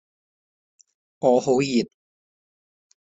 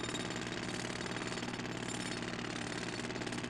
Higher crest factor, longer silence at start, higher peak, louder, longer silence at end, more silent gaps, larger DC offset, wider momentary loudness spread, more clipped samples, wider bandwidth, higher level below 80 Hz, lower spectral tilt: first, 20 dB vs 14 dB; first, 1.2 s vs 0 s; first, -6 dBFS vs -26 dBFS; first, -21 LUFS vs -39 LUFS; first, 1.3 s vs 0 s; neither; neither; first, 7 LU vs 1 LU; neither; second, 8 kHz vs 14 kHz; second, -68 dBFS vs -60 dBFS; first, -5.5 dB/octave vs -3.5 dB/octave